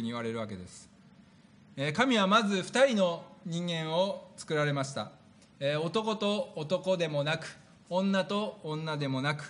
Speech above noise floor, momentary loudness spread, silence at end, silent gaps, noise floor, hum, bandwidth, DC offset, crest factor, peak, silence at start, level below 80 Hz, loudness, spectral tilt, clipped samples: 28 dB; 14 LU; 0 s; none; -58 dBFS; none; 10.5 kHz; under 0.1%; 20 dB; -12 dBFS; 0 s; -74 dBFS; -31 LUFS; -5 dB/octave; under 0.1%